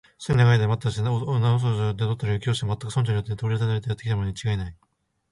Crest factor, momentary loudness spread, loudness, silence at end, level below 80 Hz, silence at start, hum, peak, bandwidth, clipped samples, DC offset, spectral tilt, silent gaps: 16 dB; 8 LU; -24 LUFS; 0.6 s; -46 dBFS; 0.2 s; none; -8 dBFS; 11 kHz; under 0.1%; under 0.1%; -6.5 dB/octave; none